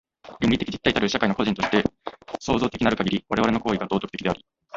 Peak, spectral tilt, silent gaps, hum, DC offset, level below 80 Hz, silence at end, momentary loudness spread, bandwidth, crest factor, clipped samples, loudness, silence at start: -2 dBFS; -5.5 dB/octave; none; none; under 0.1%; -46 dBFS; 0 s; 7 LU; 7.8 kHz; 22 dB; under 0.1%; -24 LUFS; 0.25 s